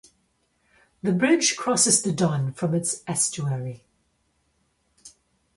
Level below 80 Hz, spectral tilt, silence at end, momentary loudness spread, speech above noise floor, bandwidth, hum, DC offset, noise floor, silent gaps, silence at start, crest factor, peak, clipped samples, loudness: -62 dBFS; -3.5 dB/octave; 0.5 s; 11 LU; 46 dB; 11.5 kHz; none; under 0.1%; -69 dBFS; none; 1.05 s; 22 dB; -4 dBFS; under 0.1%; -22 LUFS